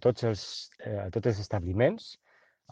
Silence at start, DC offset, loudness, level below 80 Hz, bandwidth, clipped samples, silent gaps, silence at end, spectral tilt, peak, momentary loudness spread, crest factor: 0 s; under 0.1%; -31 LUFS; -56 dBFS; 9.2 kHz; under 0.1%; none; 0.6 s; -6.5 dB/octave; -12 dBFS; 12 LU; 20 dB